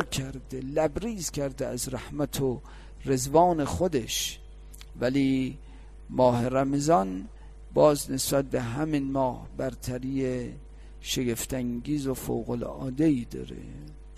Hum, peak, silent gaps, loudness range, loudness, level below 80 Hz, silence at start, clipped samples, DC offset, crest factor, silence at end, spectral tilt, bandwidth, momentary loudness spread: none; -8 dBFS; none; 5 LU; -28 LUFS; -44 dBFS; 0 s; under 0.1%; under 0.1%; 20 dB; 0 s; -5 dB/octave; 15 kHz; 16 LU